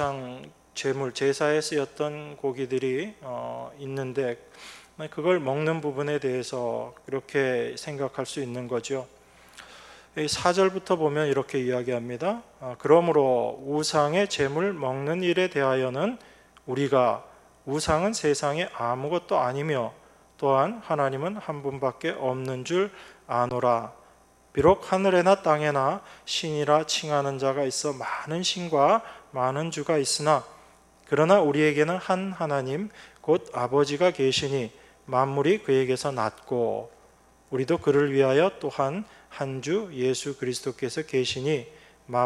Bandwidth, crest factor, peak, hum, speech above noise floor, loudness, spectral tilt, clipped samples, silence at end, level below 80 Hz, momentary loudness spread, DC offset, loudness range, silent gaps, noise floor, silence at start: 13 kHz; 22 dB; -6 dBFS; none; 32 dB; -26 LUFS; -5 dB/octave; under 0.1%; 0 s; -60 dBFS; 13 LU; under 0.1%; 5 LU; none; -57 dBFS; 0 s